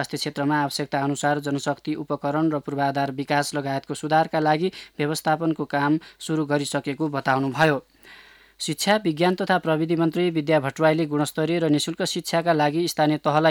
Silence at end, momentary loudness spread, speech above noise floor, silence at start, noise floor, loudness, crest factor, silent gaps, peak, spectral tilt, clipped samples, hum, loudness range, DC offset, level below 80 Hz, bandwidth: 0 s; 7 LU; 27 dB; 0 s; -49 dBFS; -23 LUFS; 18 dB; none; -6 dBFS; -5 dB/octave; under 0.1%; none; 3 LU; under 0.1%; -66 dBFS; 18 kHz